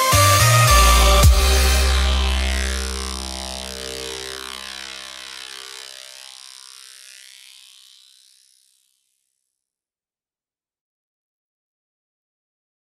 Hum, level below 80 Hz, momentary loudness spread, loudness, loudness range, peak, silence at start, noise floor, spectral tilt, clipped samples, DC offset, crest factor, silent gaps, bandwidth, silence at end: none; -24 dBFS; 25 LU; -17 LUFS; 24 LU; -2 dBFS; 0 s; under -90 dBFS; -3 dB/octave; under 0.1%; under 0.1%; 20 dB; none; 16.5 kHz; 6.7 s